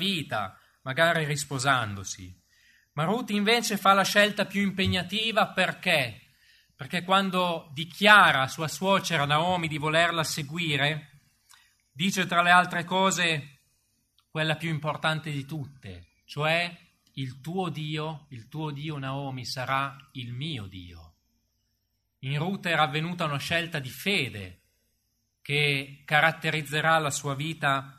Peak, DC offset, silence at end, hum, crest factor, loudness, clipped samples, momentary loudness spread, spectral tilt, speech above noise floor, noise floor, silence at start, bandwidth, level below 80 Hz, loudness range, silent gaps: -4 dBFS; under 0.1%; 0.05 s; none; 24 dB; -26 LUFS; under 0.1%; 16 LU; -4 dB/octave; 49 dB; -76 dBFS; 0 s; 13.5 kHz; -64 dBFS; 10 LU; none